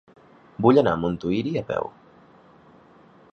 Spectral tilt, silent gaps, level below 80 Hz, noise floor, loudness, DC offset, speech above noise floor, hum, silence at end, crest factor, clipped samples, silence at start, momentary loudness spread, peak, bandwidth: -8.5 dB/octave; none; -54 dBFS; -53 dBFS; -22 LUFS; under 0.1%; 31 dB; none; 1.45 s; 22 dB; under 0.1%; 0.6 s; 14 LU; -4 dBFS; 6.8 kHz